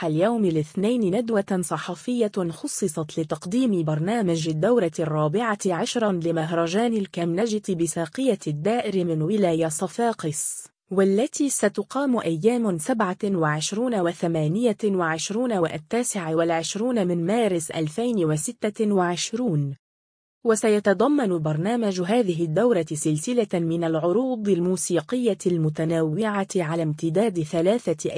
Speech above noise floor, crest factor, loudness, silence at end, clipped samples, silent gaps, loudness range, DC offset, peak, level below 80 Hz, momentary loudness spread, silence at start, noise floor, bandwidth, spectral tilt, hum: over 67 dB; 16 dB; -24 LUFS; 0 s; under 0.1%; 19.79-20.41 s; 2 LU; under 0.1%; -8 dBFS; -66 dBFS; 5 LU; 0 s; under -90 dBFS; 10.5 kHz; -5.5 dB/octave; none